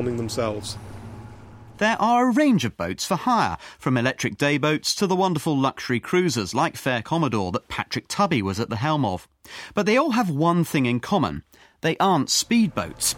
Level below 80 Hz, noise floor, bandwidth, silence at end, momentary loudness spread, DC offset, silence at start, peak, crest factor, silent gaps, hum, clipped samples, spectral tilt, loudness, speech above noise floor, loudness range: -54 dBFS; -43 dBFS; 17 kHz; 0 s; 10 LU; under 0.1%; 0 s; -6 dBFS; 18 dB; none; none; under 0.1%; -4.5 dB/octave; -22 LUFS; 21 dB; 2 LU